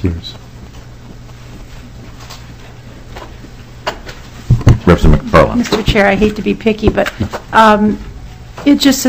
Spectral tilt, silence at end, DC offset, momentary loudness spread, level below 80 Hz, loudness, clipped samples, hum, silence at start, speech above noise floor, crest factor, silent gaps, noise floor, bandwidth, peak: -6 dB/octave; 0 s; 0.8%; 25 LU; -24 dBFS; -12 LUFS; 1%; none; 0 s; 21 dB; 14 dB; none; -33 dBFS; 16 kHz; 0 dBFS